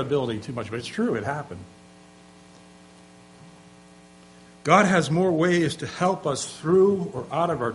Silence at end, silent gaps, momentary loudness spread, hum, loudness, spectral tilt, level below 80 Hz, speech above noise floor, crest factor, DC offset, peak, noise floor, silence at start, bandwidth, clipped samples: 0 s; none; 13 LU; 60 Hz at -50 dBFS; -23 LUFS; -5.5 dB/octave; -60 dBFS; 27 dB; 22 dB; under 0.1%; -2 dBFS; -50 dBFS; 0 s; 11.5 kHz; under 0.1%